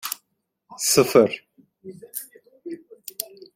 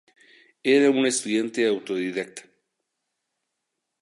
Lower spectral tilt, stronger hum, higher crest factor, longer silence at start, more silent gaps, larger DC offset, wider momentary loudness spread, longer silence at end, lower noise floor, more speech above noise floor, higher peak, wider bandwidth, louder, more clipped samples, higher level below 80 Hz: about the same, -3 dB/octave vs -3.5 dB/octave; neither; about the same, 22 dB vs 18 dB; second, 0.05 s vs 0.65 s; neither; neither; first, 26 LU vs 13 LU; second, 0.3 s vs 1.6 s; second, -74 dBFS vs -81 dBFS; second, 54 dB vs 59 dB; first, -2 dBFS vs -8 dBFS; first, 16.5 kHz vs 11.5 kHz; first, -20 LUFS vs -23 LUFS; neither; first, -64 dBFS vs -80 dBFS